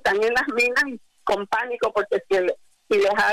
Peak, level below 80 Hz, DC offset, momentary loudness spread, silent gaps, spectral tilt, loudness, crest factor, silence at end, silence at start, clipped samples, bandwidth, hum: -14 dBFS; -58 dBFS; under 0.1%; 7 LU; none; -3 dB/octave; -22 LUFS; 8 dB; 0 s; 0.05 s; under 0.1%; 15.5 kHz; none